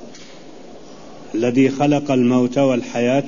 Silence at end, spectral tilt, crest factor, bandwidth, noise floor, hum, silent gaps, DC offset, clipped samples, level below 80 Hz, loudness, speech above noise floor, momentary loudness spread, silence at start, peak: 0 s; -6.5 dB/octave; 14 dB; 7.4 kHz; -40 dBFS; none; none; 1%; under 0.1%; -56 dBFS; -17 LUFS; 24 dB; 7 LU; 0 s; -4 dBFS